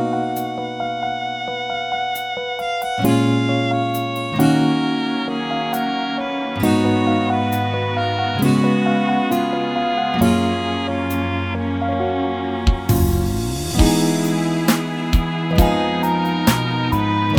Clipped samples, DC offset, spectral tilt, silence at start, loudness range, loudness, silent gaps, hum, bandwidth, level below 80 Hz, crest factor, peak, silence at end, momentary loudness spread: under 0.1%; under 0.1%; -5.5 dB/octave; 0 s; 2 LU; -19 LUFS; none; none; 19.5 kHz; -30 dBFS; 18 dB; 0 dBFS; 0 s; 7 LU